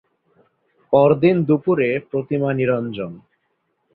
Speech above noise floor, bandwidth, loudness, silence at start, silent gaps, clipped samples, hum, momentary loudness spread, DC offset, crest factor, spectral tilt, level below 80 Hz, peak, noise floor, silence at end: 52 dB; 4.7 kHz; -18 LUFS; 0.9 s; none; under 0.1%; none; 12 LU; under 0.1%; 18 dB; -12.5 dB/octave; -60 dBFS; -2 dBFS; -70 dBFS; 0.75 s